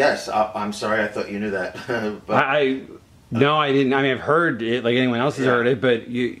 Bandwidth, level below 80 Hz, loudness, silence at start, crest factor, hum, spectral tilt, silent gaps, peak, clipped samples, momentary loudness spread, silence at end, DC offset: 13 kHz; -58 dBFS; -21 LUFS; 0 s; 20 dB; none; -5.5 dB/octave; none; -2 dBFS; under 0.1%; 8 LU; 0 s; under 0.1%